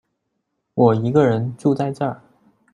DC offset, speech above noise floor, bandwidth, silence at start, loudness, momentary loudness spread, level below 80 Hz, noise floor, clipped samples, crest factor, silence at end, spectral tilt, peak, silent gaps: under 0.1%; 57 dB; 10.5 kHz; 0.75 s; -19 LUFS; 11 LU; -58 dBFS; -74 dBFS; under 0.1%; 18 dB; 0.55 s; -9 dB/octave; -2 dBFS; none